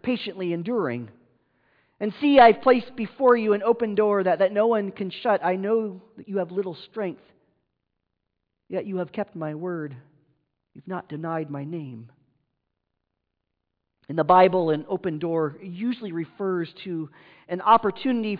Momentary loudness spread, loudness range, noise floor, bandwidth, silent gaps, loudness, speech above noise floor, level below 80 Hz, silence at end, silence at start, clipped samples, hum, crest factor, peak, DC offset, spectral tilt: 15 LU; 15 LU; -80 dBFS; 5.2 kHz; none; -24 LUFS; 57 dB; -66 dBFS; 0 s; 0.05 s; under 0.1%; none; 18 dB; -6 dBFS; under 0.1%; -9.5 dB/octave